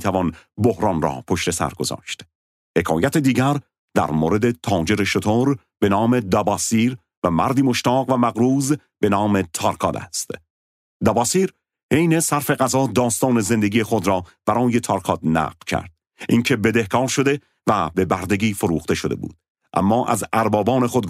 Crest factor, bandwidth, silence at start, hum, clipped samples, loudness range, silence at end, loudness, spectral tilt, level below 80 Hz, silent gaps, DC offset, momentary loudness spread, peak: 18 dB; 16 kHz; 0 s; none; under 0.1%; 2 LU; 0 s; -20 LUFS; -5 dB/octave; -50 dBFS; 2.35-2.74 s, 3.79-3.88 s, 7.17-7.22 s, 10.50-11.00 s, 11.83-11.89 s, 19.50-19.55 s; under 0.1%; 8 LU; -2 dBFS